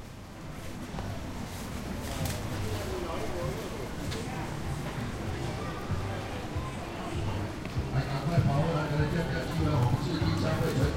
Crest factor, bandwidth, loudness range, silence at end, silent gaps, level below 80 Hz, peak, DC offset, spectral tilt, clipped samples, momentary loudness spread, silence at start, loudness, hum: 18 dB; 16 kHz; 6 LU; 0 s; none; -42 dBFS; -14 dBFS; under 0.1%; -6 dB/octave; under 0.1%; 10 LU; 0 s; -33 LUFS; none